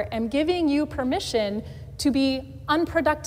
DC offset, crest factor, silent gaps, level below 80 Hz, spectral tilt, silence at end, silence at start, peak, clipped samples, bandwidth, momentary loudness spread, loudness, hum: under 0.1%; 14 dB; none; -46 dBFS; -5 dB/octave; 0 s; 0 s; -10 dBFS; under 0.1%; 16 kHz; 7 LU; -25 LUFS; none